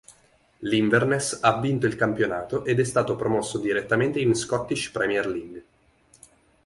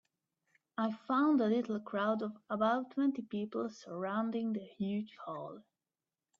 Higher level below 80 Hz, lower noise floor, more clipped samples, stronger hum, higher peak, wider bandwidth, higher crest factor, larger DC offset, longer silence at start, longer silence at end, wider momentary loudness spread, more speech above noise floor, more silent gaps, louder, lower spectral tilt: first, -56 dBFS vs -82 dBFS; second, -60 dBFS vs under -90 dBFS; neither; neither; first, -4 dBFS vs -18 dBFS; first, 11.5 kHz vs 7.2 kHz; about the same, 20 dB vs 18 dB; neither; second, 0.1 s vs 0.8 s; first, 1.05 s vs 0.8 s; second, 7 LU vs 14 LU; second, 36 dB vs over 55 dB; neither; first, -24 LUFS vs -35 LUFS; second, -5 dB/octave vs -7.5 dB/octave